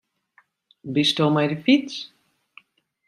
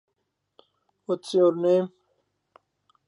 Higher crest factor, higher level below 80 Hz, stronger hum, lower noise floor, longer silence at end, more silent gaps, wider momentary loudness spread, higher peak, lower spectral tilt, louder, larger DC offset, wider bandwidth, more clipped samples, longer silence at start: about the same, 18 dB vs 18 dB; first, -68 dBFS vs -84 dBFS; neither; second, -62 dBFS vs -78 dBFS; second, 1 s vs 1.2 s; neither; first, 18 LU vs 15 LU; first, -6 dBFS vs -10 dBFS; second, -5.5 dB/octave vs -7 dB/octave; first, -21 LUFS vs -24 LUFS; neither; first, 12.5 kHz vs 11 kHz; neither; second, 0.85 s vs 1.1 s